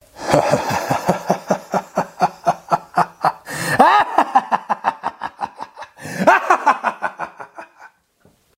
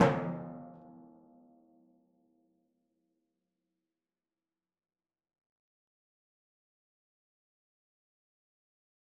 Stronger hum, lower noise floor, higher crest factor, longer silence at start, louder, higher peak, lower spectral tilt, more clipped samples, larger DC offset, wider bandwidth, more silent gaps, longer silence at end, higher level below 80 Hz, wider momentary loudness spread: neither; second, -57 dBFS vs under -90 dBFS; second, 20 dB vs 30 dB; first, 0.15 s vs 0 s; first, -18 LUFS vs -35 LUFS; first, 0 dBFS vs -10 dBFS; second, -4.5 dB/octave vs -6.5 dB/octave; neither; neither; first, 16 kHz vs 4.6 kHz; neither; second, 0.7 s vs 8.05 s; first, -56 dBFS vs -74 dBFS; second, 17 LU vs 25 LU